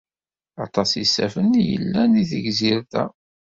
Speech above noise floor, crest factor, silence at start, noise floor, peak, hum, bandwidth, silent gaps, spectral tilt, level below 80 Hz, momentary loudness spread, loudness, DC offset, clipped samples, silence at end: over 70 dB; 18 dB; 0.6 s; under -90 dBFS; -4 dBFS; none; 7.8 kHz; none; -5 dB/octave; -54 dBFS; 8 LU; -20 LUFS; under 0.1%; under 0.1%; 0.35 s